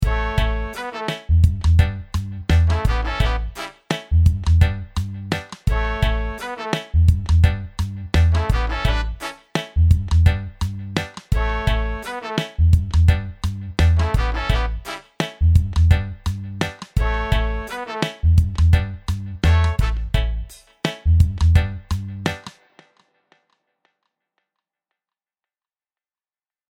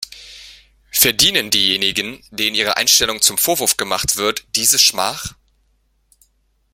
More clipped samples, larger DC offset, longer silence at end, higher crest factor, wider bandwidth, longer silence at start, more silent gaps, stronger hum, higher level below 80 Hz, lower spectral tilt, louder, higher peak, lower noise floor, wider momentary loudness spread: neither; neither; first, 4.2 s vs 1.4 s; about the same, 18 dB vs 18 dB; second, 10.5 kHz vs 17 kHz; about the same, 0 s vs 0 s; neither; neither; first, -22 dBFS vs -48 dBFS; first, -6.5 dB/octave vs -0.5 dB/octave; second, -21 LUFS vs -14 LUFS; about the same, -2 dBFS vs 0 dBFS; first, under -90 dBFS vs -62 dBFS; about the same, 11 LU vs 12 LU